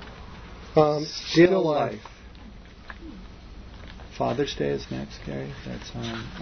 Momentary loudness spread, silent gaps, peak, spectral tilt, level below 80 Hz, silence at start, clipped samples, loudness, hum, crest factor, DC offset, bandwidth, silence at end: 26 LU; none; -6 dBFS; -6 dB/octave; -46 dBFS; 0 s; under 0.1%; -25 LUFS; none; 22 dB; under 0.1%; 6.6 kHz; 0 s